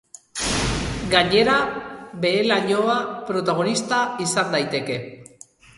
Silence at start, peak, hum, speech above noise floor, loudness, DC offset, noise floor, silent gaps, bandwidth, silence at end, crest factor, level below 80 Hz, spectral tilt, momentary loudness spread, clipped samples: 0.35 s; -2 dBFS; none; 28 dB; -21 LUFS; under 0.1%; -49 dBFS; none; 11.5 kHz; 0.55 s; 20 dB; -42 dBFS; -3.5 dB/octave; 12 LU; under 0.1%